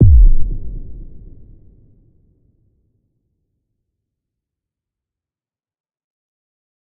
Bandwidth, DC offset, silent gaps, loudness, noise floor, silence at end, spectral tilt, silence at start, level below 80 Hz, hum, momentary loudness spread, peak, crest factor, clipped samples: 0.7 kHz; under 0.1%; none; -16 LUFS; under -90 dBFS; 5.8 s; -18.5 dB/octave; 0 s; -18 dBFS; none; 28 LU; 0 dBFS; 18 dB; under 0.1%